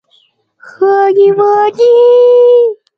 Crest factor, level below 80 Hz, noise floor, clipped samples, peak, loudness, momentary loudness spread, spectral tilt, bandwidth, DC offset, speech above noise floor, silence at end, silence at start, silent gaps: 8 dB; -64 dBFS; -53 dBFS; under 0.1%; 0 dBFS; -7 LUFS; 4 LU; -6 dB/octave; 6.2 kHz; under 0.1%; 46 dB; 0.25 s; 0.8 s; none